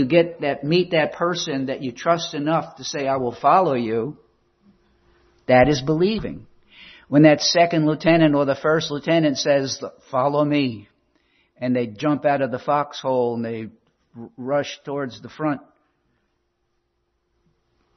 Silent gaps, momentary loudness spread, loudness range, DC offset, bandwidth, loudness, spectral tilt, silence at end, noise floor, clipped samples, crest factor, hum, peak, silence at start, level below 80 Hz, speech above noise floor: none; 13 LU; 11 LU; under 0.1%; 6.4 kHz; -20 LUFS; -5.5 dB/octave; 2.35 s; -71 dBFS; under 0.1%; 20 dB; none; -2 dBFS; 0 s; -54 dBFS; 51 dB